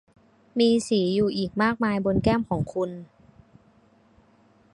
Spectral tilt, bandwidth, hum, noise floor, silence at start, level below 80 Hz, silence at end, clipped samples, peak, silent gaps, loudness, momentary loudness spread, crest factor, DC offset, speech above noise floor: -6 dB/octave; 11.5 kHz; none; -59 dBFS; 0.55 s; -48 dBFS; 1.7 s; under 0.1%; -8 dBFS; none; -24 LUFS; 9 LU; 18 dB; under 0.1%; 36 dB